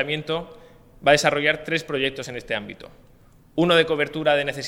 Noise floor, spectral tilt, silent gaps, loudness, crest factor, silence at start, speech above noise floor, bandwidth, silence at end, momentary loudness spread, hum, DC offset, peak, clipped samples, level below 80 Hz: -46 dBFS; -4 dB/octave; none; -22 LUFS; 22 dB; 0 s; 24 dB; 16.5 kHz; 0 s; 15 LU; none; under 0.1%; -2 dBFS; under 0.1%; -52 dBFS